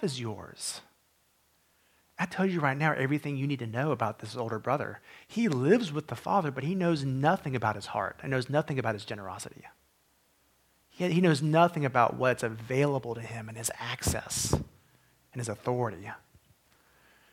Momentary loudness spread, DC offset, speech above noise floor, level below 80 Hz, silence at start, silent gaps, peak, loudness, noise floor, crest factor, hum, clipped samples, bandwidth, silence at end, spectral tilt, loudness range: 14 LU; under 0.1%; 40 dB; -56 dBFS; 0 s; none; -8 dBFS; -30 LUFS; -69 dBFS; 22 dB; none; under 0.1%; 17 kHz; 1.15 s; -5.5 dB/octave; 6 LU